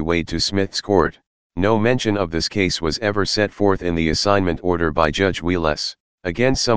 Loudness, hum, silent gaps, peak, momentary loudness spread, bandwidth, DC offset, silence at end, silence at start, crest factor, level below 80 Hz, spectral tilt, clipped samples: -20 LUFS; none; 1.27-1.50 s, 6.00-6.18 s; 0 dBFS; 5 LU; 10 kHz; 2%; 0 s; 0 s; 18 dB; -38 dBFS; -4.5 dB/octave; under 0.1%